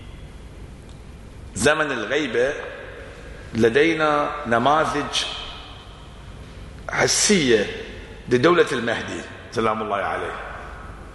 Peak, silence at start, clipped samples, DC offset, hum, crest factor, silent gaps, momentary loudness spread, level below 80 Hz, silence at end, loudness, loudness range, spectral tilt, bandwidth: -4 dBFS; 0 s; under 0.1%; under 0.1%; none; 20 dB; none; 24 LU; -44 dBFS; 0 s; -21 LUFS; 3 LU; -3.5 dB/octave; 11.5 kHz